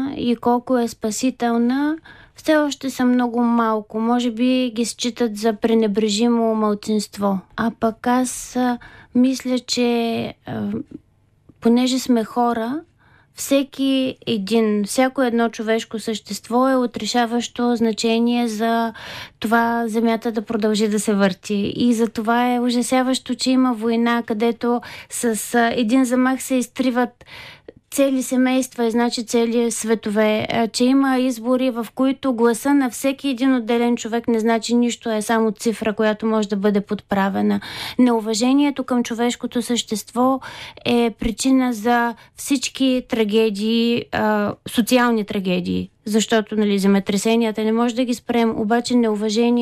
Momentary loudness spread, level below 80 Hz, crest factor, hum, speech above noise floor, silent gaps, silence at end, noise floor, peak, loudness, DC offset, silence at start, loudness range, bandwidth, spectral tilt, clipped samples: 6 LU; -52 dBFS; 14 dB; none; 35 dB; none; 0 s; -54 dBFS; -6 dBFS; -20 LUFS; under 0.1%; 0 s; 2 LU; 15 kHz; -4.5 dB/octave; under 0.1%